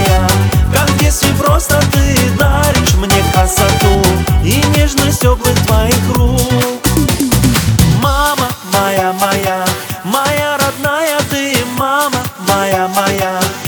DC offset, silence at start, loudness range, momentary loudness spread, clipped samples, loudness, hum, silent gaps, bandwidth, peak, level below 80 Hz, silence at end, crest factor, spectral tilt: under 0.1%; 0 s; 3 LU; 4 LU; under 0.1%; -12 LUFS; none; none; over 20 kHz; 0 dBFS; -20 dBFS; 0 s; 12 dB; -4.5 dB/octave